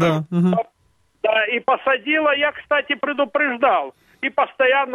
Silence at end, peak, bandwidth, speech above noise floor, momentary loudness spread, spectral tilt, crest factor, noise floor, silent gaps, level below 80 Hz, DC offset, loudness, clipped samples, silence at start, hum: 0 s; -4 dBFS; 10 kHz; 43 dB; 7 LU; -6.5 dB/octave; 16 dB; -62 dBFS; none; -62 dBFS; under 0.1%; -19 LUFS; under 0.1%; 0 s; none